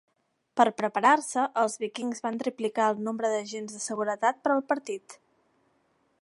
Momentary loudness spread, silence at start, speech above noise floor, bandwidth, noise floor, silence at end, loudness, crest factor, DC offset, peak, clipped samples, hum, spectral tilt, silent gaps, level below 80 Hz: 11 LU; 0.55 s; 43 dB; 11.5 kHz; -70 dBFS; 1.05 s; -28 LUFS; 22 dB; under 0.1%; -6 dBFS; under 0.1%; none; -3.5 dB/octave; none; -82 dBFS